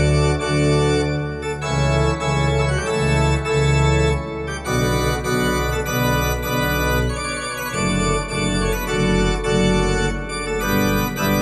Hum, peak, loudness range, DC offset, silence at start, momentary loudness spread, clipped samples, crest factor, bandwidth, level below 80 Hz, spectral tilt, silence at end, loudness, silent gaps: none; -6 dBFS; 1 LU; under 0.1%; 0 s; 6 LU; under 0.1%; 14 dB; 12.5 kHz; -28 dBFS; -5 dB/octave; 0 s; -20 LUFS; none